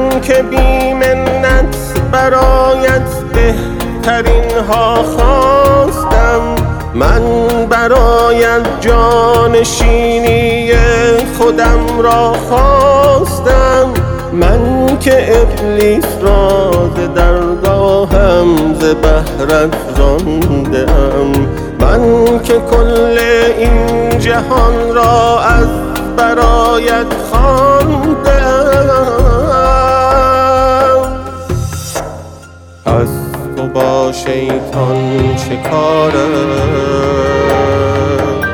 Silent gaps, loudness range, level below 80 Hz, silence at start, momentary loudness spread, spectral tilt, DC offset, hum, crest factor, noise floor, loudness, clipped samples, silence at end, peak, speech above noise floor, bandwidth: none; 3 LU; -16 dBFS; 0 s; 6 LU; -6 dB/octave; under 0.1%; none; 10 dB; -33 dBFS; -10 LUFS; under 0.1%; 0 s; 0 dBFS; 25 dB; over 20 kHz